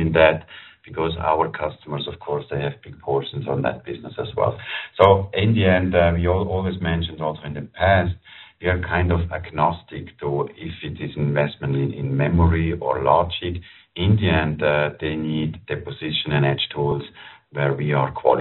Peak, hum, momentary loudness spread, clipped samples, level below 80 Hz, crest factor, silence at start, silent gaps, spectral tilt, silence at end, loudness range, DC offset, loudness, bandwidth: 0 dBFS; none; 13 LU; under 0.1%; -40 dBFS; 22 dB; 0 s; none; -5 dB/octave; 0 s; 5 LU; under 0.1%; -22 LUFS; 4.2 kHz